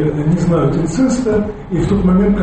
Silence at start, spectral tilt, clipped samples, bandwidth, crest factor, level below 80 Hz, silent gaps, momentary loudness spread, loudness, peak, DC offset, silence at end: 0 s; -8 dB/octave; under 0.1%; 8.8 kHz; 10 dB; -28 dBFS; none; 6 LU; -15 LUFS; -4 dBFS; under 0.1%; 0 s